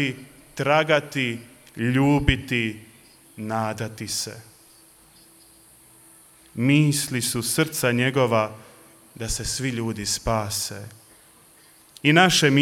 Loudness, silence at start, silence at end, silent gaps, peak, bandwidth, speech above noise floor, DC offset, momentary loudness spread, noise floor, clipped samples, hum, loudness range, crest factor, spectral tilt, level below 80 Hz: -22 LUFS; 0 s; 0 s; none; -2 dBFS; 17 kHz; 31 dB; under 0.1%; 18 LU; -53 dBFS; under 0.1%; none; 9 LU; 22 dB; -4 dB/octave; -44 dBFS